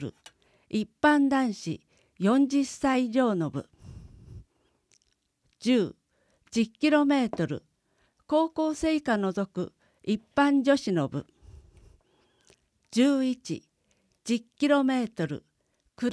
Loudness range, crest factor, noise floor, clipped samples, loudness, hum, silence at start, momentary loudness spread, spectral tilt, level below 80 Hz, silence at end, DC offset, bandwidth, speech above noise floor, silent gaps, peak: 5 LU; 18 dB; -73 dBFS; under 0.1%; -27 LUFS; none; 0 s; 15 LU; -5.5 dB/octave; -60 dBFS; 0 s; under 0.1%; 11 kHz; 47 dB; none; -10 dBFS